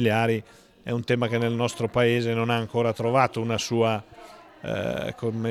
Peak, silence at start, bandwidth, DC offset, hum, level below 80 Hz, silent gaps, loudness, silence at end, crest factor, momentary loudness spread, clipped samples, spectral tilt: -6 dBFS; 0 s; 13.5 kHz; under 0.1%; none; -58 dBFS; none; -25 LUFS; 0 s; 20 dB; 9 LU; under 0.1%; -6 dB/octave